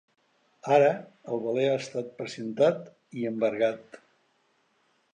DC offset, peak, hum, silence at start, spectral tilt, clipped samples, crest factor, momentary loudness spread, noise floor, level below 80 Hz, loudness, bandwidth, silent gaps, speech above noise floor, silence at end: under 0.1%; -8 dBFS; none; 0.65 s; -6 dB/octave; under 0.1%; 22 dB; 16 LU; -70 dBFS; -80 dBFS; -27 LUFS; 9.4 kHz; none; 43 dB; 1.15 s